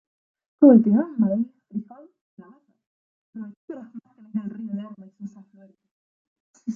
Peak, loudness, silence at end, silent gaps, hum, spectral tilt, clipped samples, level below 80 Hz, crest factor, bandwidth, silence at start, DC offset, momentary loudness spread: -2 dBFS; -20 LUFS; 0 s; 2.21-2.37 s, 2.86-3.33 s, 3.57-3.68 s, 5.91-6.54 s; none; -11 dB/octave; under 0.1%; -76 dBFS; 22 dB; 3 kHz; 0.6 s; under 0.1%; 26 LU